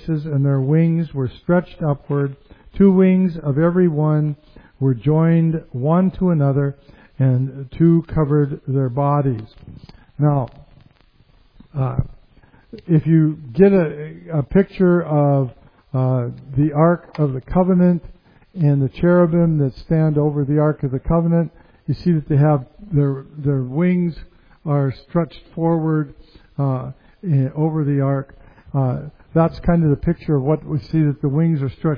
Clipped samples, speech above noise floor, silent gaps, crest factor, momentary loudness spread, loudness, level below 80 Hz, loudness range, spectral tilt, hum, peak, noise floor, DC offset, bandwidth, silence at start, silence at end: under 0.1%; 36 dB; none; 18 dB; 10 LU; -18 LUFS; -40 dBFS; 5 LU; -12.5 dB/octave; none; 0 dBFS; -53 dBFS; under 0.1%; 5.2 kHz; 0 s; 0 s